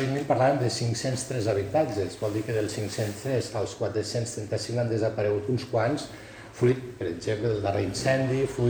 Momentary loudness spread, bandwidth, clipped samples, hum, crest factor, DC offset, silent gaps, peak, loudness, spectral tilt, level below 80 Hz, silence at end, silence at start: 6 LU; over 20 kHz; under 0.1%; none; 16 dB; under 0.1%; none; -10 dBFS; -28 LUFS; -5.5 dB/octave; -56 dBFS; 0 s; 0 s